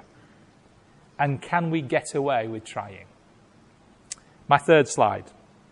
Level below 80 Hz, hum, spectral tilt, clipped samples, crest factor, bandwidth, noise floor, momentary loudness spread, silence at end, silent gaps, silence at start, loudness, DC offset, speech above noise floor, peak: -62 dBFS; none; -5 dB/octave; under 0.1%; 22 dB; 11.5 kHz; -56 dBFS; 21 LU; 0.5 s; none; 1.2 s; -24 LUFS; under 0.1%; 32 dB; -4 dBFS